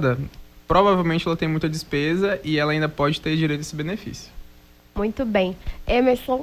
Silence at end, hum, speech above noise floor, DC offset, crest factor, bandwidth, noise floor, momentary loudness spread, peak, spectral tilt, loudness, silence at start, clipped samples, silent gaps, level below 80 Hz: 0 s; none; 28 dB; under 0.1%; 18 dB; 16 kHz; -49 dBFS; 12 LU; -4 dBFS; -6 dB/octave; -22 LUFS; 0 s; under 0.1%; none; -40 dBFS